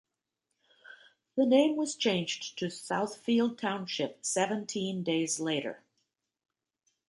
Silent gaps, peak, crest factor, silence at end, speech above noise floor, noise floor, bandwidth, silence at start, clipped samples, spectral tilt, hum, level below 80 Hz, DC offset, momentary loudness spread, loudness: none; -12 dBFS; 20 dB; 1.3 s; 55 dB; -85 dBFS; 11.5 kHz; 0.9 s; under 0.1%; -4 dB/octave; none; -78 dBFS; under 0.1%; 10 LU; -31 LUFS